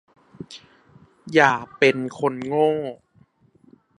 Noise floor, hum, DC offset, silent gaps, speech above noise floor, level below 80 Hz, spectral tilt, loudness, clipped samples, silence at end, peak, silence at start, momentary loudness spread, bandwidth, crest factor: -58 dBFS; none; under 0.1%; none; 38 dB; -66 dBFS; -5.5 dB/octave; -20 LUFS; under 0.1%; 1.05 s; 0 dBFS; 0.4 s; 23 LU; 10.5 kHz; 24 dB